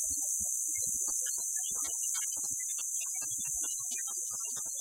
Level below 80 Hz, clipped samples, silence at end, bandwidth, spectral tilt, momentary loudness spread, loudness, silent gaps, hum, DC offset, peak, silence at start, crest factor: -66 dBFS; under 0.1%; 0 s; 16 kHz; 1.5 dB/octave; 3 LU; -32 LUFS; none; none; under 0.1%; -18 dBFS; 0 s; 16 dB